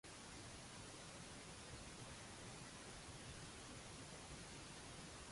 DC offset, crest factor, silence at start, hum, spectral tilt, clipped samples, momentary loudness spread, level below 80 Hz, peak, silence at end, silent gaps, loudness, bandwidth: under 0.1%; 14 dB; 0.05 s; none; -3 dB/octave; under 0.1%; 1 LU; -66 dBFS; -42 dBFS; 0 s; none; -55 LUFS; 11.5 kHz